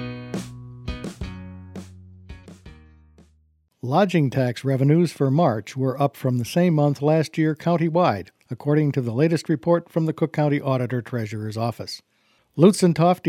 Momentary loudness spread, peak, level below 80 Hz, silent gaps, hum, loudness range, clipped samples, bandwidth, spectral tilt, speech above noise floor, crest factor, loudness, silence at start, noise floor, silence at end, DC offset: 17 LU; -2 dBFS; -50 dBFS; none; none; 10 LU; under 0.1%; 15 kHz; -7 dB/octave; 42 dB; 20 dB; -21 LUFS; 0 s; -63 dBFS; 0 s; under 0.1%